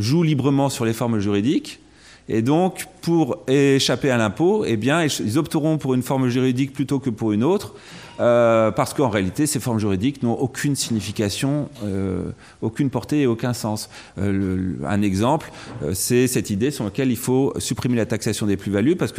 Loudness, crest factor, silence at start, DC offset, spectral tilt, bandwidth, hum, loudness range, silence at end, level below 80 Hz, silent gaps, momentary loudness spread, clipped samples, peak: -21 LUFS; 14 dB; 0 s; under 0.1%; -5.5 dB/octave; 16 kHz; none; 4 LU; 0 s; -54 dBFS; none; 7 LU; under 0.1%; -6 dBFS